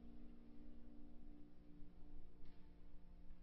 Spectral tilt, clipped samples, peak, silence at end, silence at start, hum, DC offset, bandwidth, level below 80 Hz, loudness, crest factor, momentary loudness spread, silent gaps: -8 dB/octave; under 0.1%; -42 dBFS; 0 s; 0 s; none; under 0.1%; 4.4 kHz; -60 dBFS; -66 LUFS; 10 dB; 4 LU; none